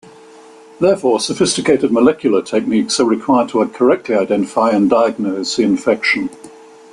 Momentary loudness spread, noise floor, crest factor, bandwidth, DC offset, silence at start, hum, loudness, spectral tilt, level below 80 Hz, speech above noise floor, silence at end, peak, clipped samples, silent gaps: 4 LU; -40 dBFS; 14 dB; 11.5 kHz; under 0.1%; 0.8 s; none; -15 LUFS; -4.5 dB/octave; -56 dBFS; 26 dB; 0.45 s; -2 dBFS; under 0.1%; none